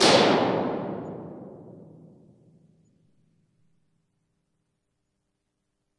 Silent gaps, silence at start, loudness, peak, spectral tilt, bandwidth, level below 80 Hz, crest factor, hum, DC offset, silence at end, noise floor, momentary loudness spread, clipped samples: none; 0 s; -24 LUFS; -6 dBFS; -3.5 dB/octave; 11.5 kHz; -66 dBFS; 24 dB; none; under 0.1%; 4.2 s; -79 dBFS; 27 LU; under 0.1%